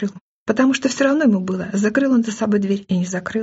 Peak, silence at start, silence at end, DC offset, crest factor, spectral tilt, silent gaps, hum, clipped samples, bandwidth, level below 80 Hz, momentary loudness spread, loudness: -4 dBFS; 0 s; 0 s; under 0.1%; 14 dB; -5.5 dB/octave; 0.21-0.46 s; none; under 0.1%; 8 kHz; -58 dBFS; 7 LU; -19 LUFS